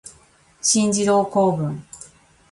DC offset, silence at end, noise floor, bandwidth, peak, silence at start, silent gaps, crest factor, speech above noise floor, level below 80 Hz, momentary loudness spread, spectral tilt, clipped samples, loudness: under 0.1%; 0.55 s; -54 dBFS; 11.5 kHz; -4 dBFS; 0.05 s; none; 16 dB; 35 dB; -58 dBFS; 19 LU; -4 dB/octave; under 0.1%; -19 LUFS